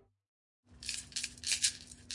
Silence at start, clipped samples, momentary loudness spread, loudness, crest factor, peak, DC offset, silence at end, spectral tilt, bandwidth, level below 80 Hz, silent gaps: 0.7 s; under 0.1%; 13 LU; -35 LUFS; 26 dB; -16 dBFS; under 0.1%; 0 s; 1.5 dB/octave; 11.5 kHz; -64 dBFS; none